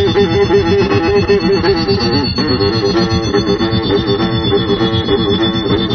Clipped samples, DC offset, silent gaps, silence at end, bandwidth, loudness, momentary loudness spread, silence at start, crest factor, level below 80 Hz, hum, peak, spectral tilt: under 0.1%; under 0.1%; none; 0 s; 6.6 kHz; -13 LUFS; 2 LU; 0 s; 12 dB; -30 dBFS; none; 0 dBFS; -6.5 dB/octave